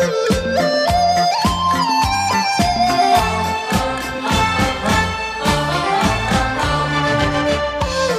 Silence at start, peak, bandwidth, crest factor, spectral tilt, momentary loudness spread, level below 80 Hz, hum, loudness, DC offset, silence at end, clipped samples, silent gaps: 0 s; -4 dBFS; 16 kHz; 14 dB; -4 dB/octave; 4 LU; -32 dBFS; none; -17 LUFS; under 0.1%; 0 s; under 0.1%; none